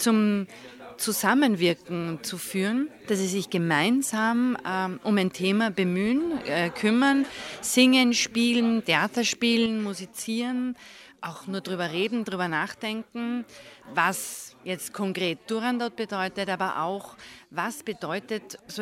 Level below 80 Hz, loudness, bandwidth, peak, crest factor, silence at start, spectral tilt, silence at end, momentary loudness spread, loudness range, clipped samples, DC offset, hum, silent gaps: -66 dBFS; -26 LUFS; 16 kHz; -6 dBFS; 20 dB; 0 s; -4 dB/octave; 0 s; 13 LU; 7 LU; under 0.1%; under 0.1%; none; none